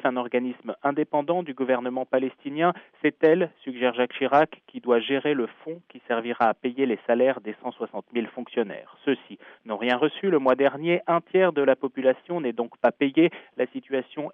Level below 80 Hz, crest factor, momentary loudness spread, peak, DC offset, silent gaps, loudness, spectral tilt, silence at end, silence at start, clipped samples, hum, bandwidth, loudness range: -78 dBFS; 18 dB; 10 LU; -8 dBFS; under 0.1%; none; -25 LUFS; -8 dB/octave; 0 s; 0.05 s; under 0.1%; none; 5.6 kHz; 4 LU